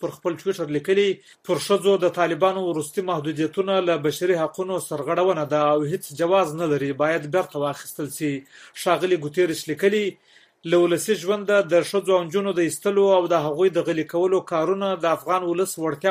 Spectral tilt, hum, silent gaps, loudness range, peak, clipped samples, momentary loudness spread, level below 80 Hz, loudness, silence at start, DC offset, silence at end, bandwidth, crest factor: -5 dB/octave; none; none; 3 LU; -6 dBFS; under 0.1%; 8 LU; -68 dBFS; -22 LUFS; 0 s; under 0.1%; 0 s; 15.5 kHz; 16 dB